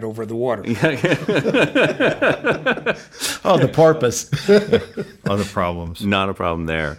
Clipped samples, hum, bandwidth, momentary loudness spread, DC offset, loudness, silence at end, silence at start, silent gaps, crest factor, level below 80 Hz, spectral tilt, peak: under 0.1%; none; 16.5 kHz; 9 LU; under 0.1%; -18 LUFS; 0 s; 0 s; none; 16 dB; -46 dBFS; -5 dB/octave; -4 dBFS